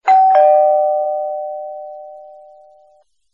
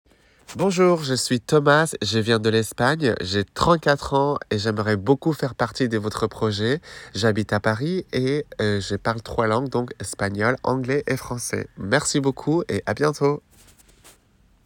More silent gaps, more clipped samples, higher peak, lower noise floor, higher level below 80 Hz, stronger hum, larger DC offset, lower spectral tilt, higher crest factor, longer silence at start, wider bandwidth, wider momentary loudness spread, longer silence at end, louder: neither; neither; about the same, -2 dBFS vs -4 dBFS; second, -54 dBFS vs -58 dBFS; second, -74 dBFS vs -50 dBFS; neither; neither; second, -2.5 dB/octave vs -5 dB/octave; second, 14 dB vs 20 dB; second, 0.05 s vs 0.5 s; second, 7.2 kHz vs 18 kHz; first, 23 LU vs 8 LU; first, 1.05 s vs 0.55 s; first, -13 LUFS vs -22 LUFS